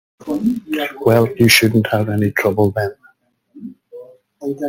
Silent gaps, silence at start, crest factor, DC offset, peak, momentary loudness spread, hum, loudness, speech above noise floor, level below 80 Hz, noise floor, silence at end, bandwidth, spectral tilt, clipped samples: none; 0.25 s; 18 dB; under 0.1%; 0 dBFS; 22 LU; none; -16 LUFS; 41 dB; -52 dBFS; -55 dBFS; 0 s; 17 kHz; -5 dB/octave; under 0.1%